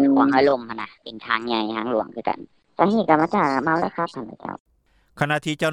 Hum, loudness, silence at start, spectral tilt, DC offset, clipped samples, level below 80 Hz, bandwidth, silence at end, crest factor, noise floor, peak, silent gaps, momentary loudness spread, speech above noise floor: none; -21 LUFS; 0 s; -6 dB/octave; under 0.1%; under 0.1%; -60 dBFS; 12 kHz; 0 s; 20 dB; -57 dBFS; -2 dBFS; 4.60-4.66 s; 17 LU; 36 dB